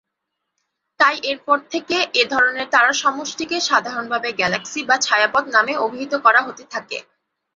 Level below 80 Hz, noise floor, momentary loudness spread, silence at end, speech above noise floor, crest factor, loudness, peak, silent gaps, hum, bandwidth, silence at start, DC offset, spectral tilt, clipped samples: -64 dBFS; -78 dBFS; 11 LU; 0.55 s; 59 dB; 18 dB; -18 LUFS; 0 dBFS; none; none; 7.8 kHz; 1 s; under 0.1%; -1.5 dB/octave; under 0.1%